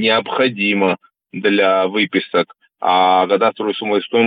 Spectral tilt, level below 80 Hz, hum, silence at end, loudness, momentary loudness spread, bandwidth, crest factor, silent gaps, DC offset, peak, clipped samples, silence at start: -8 dB/octave; -66 dBFS; none; 0 s; -16 LUFS; 8 LU; 5 kHz; 14 dB; none; under 0.1%; -2 dBFS; under 0.1%; 0 s